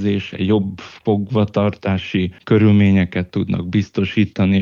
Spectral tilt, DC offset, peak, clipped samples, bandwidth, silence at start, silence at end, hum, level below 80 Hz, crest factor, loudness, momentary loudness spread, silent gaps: -8.5 dB/octave; under 0.1%; -2 dBFS; under 0.1%; 6.8 kHz; 0 s; 0 s; none; -48 dBFS; 14 dB; -18 LUFS; 8 LU; none